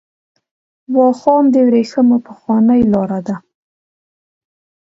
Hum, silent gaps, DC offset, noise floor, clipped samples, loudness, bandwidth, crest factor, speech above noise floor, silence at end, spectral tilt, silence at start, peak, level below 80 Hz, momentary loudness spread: none; none; under 0.1%; under -90 dBFS; under 0.1%; -13 LUFS; 7.6 kHz; 14 dB; over 78 dB; 1.5 s; -8.5 dB/octave; 0.9 s; 0 dBFS; -52 dBFS; 10 LU